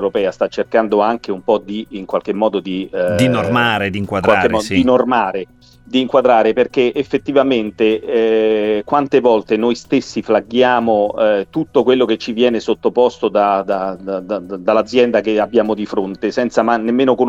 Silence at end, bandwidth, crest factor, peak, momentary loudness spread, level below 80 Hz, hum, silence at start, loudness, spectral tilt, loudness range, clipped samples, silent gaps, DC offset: 0 s; 12.5 kHz; 14 dB; 0 dBFS; 7 LU; -50 dBFS; none; 0 s; -15 LUFS; -6 dB/octave; 2 LU; under 0.1%; none; under 0.1%